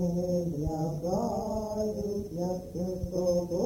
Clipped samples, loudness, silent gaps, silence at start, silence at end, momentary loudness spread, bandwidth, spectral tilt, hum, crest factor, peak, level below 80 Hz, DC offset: under 0.1%; -32 LUFS; none; 0 s; 0 s; 5 LU; 17 kHz; -8 dB/octave; none; 14 dB; -16 dBFS; -48 dBFS; under 0.1%